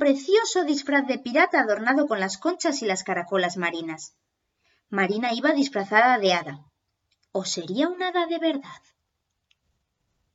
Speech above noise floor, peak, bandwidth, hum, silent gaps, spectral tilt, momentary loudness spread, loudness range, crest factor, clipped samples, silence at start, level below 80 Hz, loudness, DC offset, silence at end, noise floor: 54 dB; -6 dBFS; 8 kHz; none; none; -3.5 dB/octave; 11 LU; 6 LU; 20 dB; under 0.1%; 0 s; -78 dBFS; -24 LUFS; under 0.1%; 1.6 s; -78 dBFS